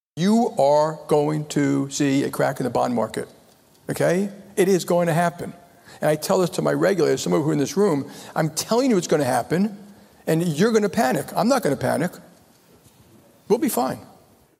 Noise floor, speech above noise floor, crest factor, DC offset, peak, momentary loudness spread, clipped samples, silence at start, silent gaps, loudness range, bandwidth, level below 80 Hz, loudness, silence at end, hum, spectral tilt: -54 dBFS; 33 dB; 16 dB; under 0.1%; -6 dBFS; 8 LU; under 0.1%; 0.15 s; none; 2 LU; 16 kHz; -62 dBFS; -21 LUFS; 0.55 s; none; -5.5 dB/octave